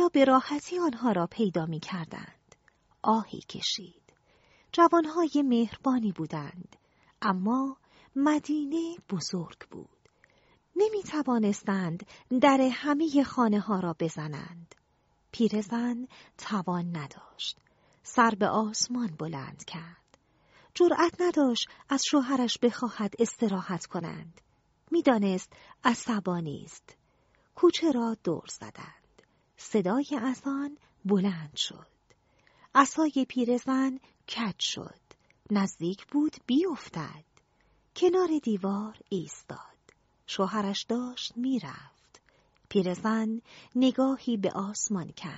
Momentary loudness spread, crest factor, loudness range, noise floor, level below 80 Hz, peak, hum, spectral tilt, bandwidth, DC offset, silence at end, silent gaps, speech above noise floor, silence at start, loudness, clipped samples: 17 LU; 24 dB; 5 LU; -70 dBFS; -70 dBFS; -6 dBFS; none; -4.5 dB/octave; 8 kHz; under 0.1%; 0 s; none; 41 dB; 0 s; -29 LUFS; under 0.1%